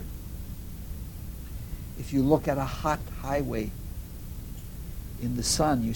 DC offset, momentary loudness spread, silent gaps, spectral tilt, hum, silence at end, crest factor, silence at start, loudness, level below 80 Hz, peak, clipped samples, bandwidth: under 0.1%; 16 LU; none; -5 dB/octave; none; 0 s; 22 dB; 0 s; -31 LUFS; -40 dBFS; -8 dBFS; under 0.1%; 17.5 kHz